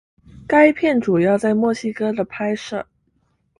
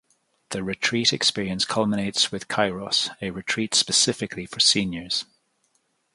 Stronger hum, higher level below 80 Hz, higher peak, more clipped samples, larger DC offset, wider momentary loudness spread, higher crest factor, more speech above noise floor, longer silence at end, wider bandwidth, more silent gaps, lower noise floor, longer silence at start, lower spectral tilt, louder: neither; about the same, -56 dBFS vs -58 dBFS; first, 0 dBFS vs -6 dBFS; neither; neither; about the same, 11 LU vs 12 LU; about the same, 18 dB vs 20 dB; about the same, 48 dB vs 45 dB; second, 0.75 s vs 0.9 s; about the same, 11 kHz vs 11.5 kHz; neither; second, -65 dBFS vs -69 dBFS; about the same, 0.4 s vs 0.5 s; first, -6.5 dB/octave vs -2.5 dB/octave; first, -18 LUFS vs -22 LUFS